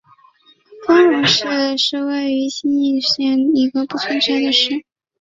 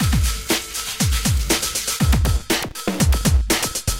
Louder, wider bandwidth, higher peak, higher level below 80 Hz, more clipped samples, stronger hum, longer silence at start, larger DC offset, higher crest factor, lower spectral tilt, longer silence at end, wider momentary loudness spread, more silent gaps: first, -16 LUFS vs -20 LUFS; second, 7.6 kHz vs 17 kHz; about the same, -2 dBFS vs -4 dBFS; second, -62 dBFS vs -22 dBFS; neither; neither; first, 0.7 s vs 0 s; neither; about the same, 16 dB vs 14 dB; about the same, -3.5 dB/octave vs -3.5 dB/octave; first, 0.4 s vs 0 s; first, 8 LU vs 4 LU; neither